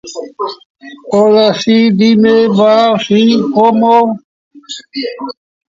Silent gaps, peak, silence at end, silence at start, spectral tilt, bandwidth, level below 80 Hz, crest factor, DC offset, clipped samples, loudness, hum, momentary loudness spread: 0.66-0.75 s, 4.24-4.51 s; 0 dBFS; 0.45 s; 0.05 s; -6 dB/octave; 7.6 kHz; -56 dBFS; 10 dB; under 0.1%; under 0.1%; -10 LUFS; none; 17 LU